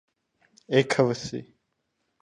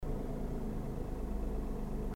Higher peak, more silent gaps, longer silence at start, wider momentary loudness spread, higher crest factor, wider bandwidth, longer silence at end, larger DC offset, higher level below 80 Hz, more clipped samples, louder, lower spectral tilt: first, -6 dBFS vs -26 dBFS; neither; first, 0.7 s vs 0 s; first, 14 LU vs 1 LU; first, 22 dB vs 12 dB; second, 11 kHz vs 16 kHz; first, 0.8 s vs 0 s; neither; second, -64 dBFS vs -38 dBFS; neither; first, -25 LUFS vs -41 LUFS; second, -5.5 dB/octave vs -8.5 dB/octave